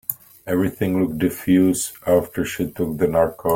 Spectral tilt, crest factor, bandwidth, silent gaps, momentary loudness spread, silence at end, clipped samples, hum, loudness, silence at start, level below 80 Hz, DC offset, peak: -6 dB/octave; 18 dB; 17 kHz; none; 8 LU; 0 s; under 0.1%; none; -21 LUFS; 0.1 s; -48 dBFS; under 0.1%; -2 dBFS